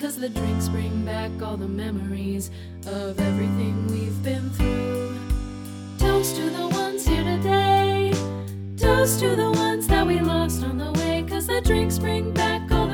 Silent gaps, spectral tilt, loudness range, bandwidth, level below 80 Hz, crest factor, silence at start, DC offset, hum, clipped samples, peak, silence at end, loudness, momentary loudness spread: none; -5.5 dB/octave; 6 LU; 19.5 kHz; -32 dBFS; 18 dB; 0 s; under 0.1%; none; under 0.1%; -4 dBFS; 0 s; -24 LUFS; 10 LU